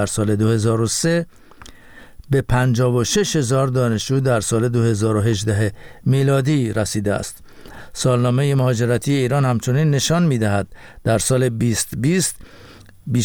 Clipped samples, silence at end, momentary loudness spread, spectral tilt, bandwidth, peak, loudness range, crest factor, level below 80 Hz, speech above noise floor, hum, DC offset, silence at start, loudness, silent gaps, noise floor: under 0.1%; 0 s; 6 LU; -5.5 dB/octave; 19 kHz; -6 dBFS; 2 LU; 12 dB; -42 dBFS; 24 dB; none; under 0.1%; 0 s; -18 LUFS; none; -42 dBFS